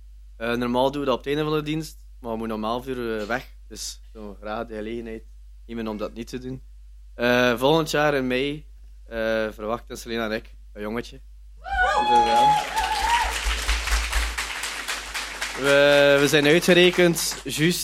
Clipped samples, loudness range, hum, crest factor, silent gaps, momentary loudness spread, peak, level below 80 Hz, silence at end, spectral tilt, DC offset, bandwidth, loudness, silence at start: under 0.1%; 13 LU; none; 20 dB; none; 18 LU; -4 dBFS; -38 dBFS; 0 s; -4 dB/octave; under 0.1%; 16.5 kHz; -22 LUFS; 0 s